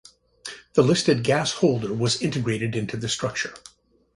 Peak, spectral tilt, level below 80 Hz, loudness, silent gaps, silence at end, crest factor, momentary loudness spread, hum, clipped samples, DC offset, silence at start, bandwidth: -4 dBFS; -5 dB/octave; -56 dBFS; -23 LUFS; none; 0.55 s; 20 dB; 12 LU; none; under 0.1%; under 0.1%; 0.45 s; 11.5 kHz